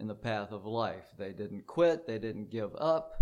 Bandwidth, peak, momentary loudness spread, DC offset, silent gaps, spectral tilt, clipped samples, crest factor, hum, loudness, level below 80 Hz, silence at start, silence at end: 10.5 kHz; -10 dBFS; 13 LU; under 0.1%; none; -7 dB/octave; under 0.1%; 22 dB; none; -34 LUFS; -60 dBFS; 0 s; 0 s